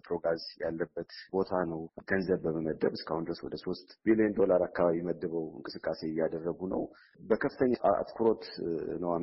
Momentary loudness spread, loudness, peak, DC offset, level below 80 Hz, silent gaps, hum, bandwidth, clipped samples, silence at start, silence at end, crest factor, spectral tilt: 11 LU; -32 LUFS; -14 dBFS; under 0.1%; -62 dBFS; none; none; 5.8 kHz; under 0.1%; 0.05 s; 0 s; 18 dB; -5.5 dB/octave